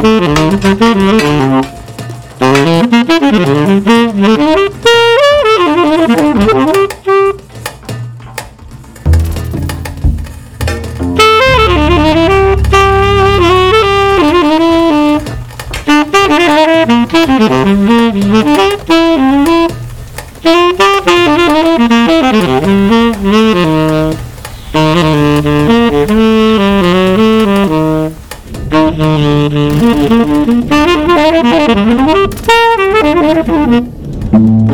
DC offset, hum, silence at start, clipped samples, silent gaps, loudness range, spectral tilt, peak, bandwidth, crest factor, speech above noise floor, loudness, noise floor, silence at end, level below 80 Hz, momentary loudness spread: 0.6%; none; 0 s; under 0.1%; none; 3 LU; -6 dB/octave; 0 dBFS; 18 kHz; 8 dB; 23 dB; -8 LUFS; -30 dBFS; 0 s; -24 dBFS; 12 LU